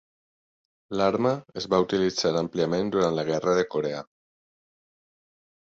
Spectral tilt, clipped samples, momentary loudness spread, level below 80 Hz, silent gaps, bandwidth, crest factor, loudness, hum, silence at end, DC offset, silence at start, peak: -5.5 dB/octave; under 0.1%; 7 LU; -60 dBFS; none; 8 kHz; 20 dB; -25 LUFS; none; 1.75 s; under 0.1%; 0.9 s; -8 dBFS